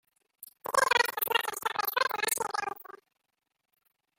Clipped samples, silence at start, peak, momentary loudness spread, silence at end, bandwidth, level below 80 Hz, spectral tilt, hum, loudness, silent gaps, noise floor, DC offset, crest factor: under 0.1%; 0.4 s; -10 dBFS; 12 LU; 1.3 s; 17 kHz; -76 dBFS; 0.5 dB/octave; none; -29 LUFS; none; -82 dBFS; under 0.1%; 24 dB